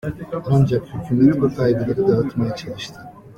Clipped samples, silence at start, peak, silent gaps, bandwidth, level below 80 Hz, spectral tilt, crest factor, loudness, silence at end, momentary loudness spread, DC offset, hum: under 0.1%; 0.05 s; -2 dBFS; none; 10 kHz; -46 dBFS; -8.5 dB/octave; 16 dB; -19 LUFS; 0.05 s; 13 LU; under 0.1%; none